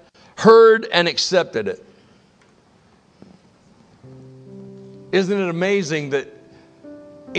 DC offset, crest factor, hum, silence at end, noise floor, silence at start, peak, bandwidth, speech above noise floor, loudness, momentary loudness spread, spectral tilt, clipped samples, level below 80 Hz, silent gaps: under 0.1%; 20 dB; none; 0 s; -54 dBFS; 0.4 s; 0 dBFS; 8.6 kHz; 39 dB; -17 LUFS; 27 LU; -4.5 dB/octave; under 0.1%; -66 dBFS; none